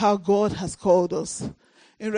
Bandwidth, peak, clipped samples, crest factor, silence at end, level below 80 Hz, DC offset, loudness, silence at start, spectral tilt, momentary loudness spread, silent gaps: 10 kHz; -6 dBFS; under 0.1%; 16 dB; 0 s; -54 dBFS; under 0.1%; -23 LUFS; 0 s; -5.5 dB/octave; 13 LU; none